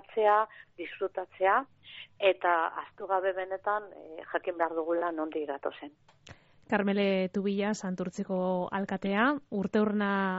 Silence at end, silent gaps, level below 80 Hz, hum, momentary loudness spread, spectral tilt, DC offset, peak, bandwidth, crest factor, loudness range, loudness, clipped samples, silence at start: 0 s; none; -72 dBFS; none; 13 LU; -4.5 dB/octave; under 0.1%; -12 dBFS; 7.6 kHz; 18 dB; 4 LU; -30 LUFS; under 0.1%; 0.1 s